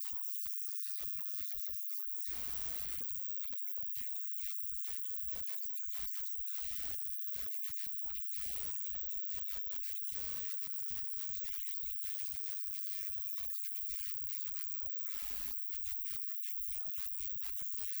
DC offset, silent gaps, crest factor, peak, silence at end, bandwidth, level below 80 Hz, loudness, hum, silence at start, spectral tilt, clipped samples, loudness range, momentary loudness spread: under 0.1%; none; 18 dB; -22 dBFS; 0 s; over 20 kHz; -64 dBFS; -36 LUFS; none; 0 s; -0.5 dB/octave; under 0.1%; 0 LU; 0 LU